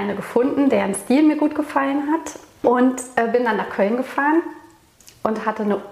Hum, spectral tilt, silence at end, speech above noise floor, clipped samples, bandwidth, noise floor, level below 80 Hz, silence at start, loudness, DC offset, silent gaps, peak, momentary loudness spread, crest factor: none; -5.5 dB/octave; 0 s; 31 dB; under 0.1%; 15 kHz; -50 dBFS; -60 dBFS; 0 s; -20 LUFS; under 0.1%; none; -2 dBFS; 7 LU; 18 dB